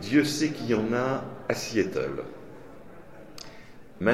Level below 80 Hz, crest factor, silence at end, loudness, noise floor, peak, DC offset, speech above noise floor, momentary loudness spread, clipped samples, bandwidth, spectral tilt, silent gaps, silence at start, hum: -58 dBFS; 20 dB; 0 s; -28 LUFS; -48 dBFS; -10 dBFS; 0.4%; 22 dB; 23 LU; under 0.1%; 15.5 kHz; -5 dB/octave; none; 0 s; none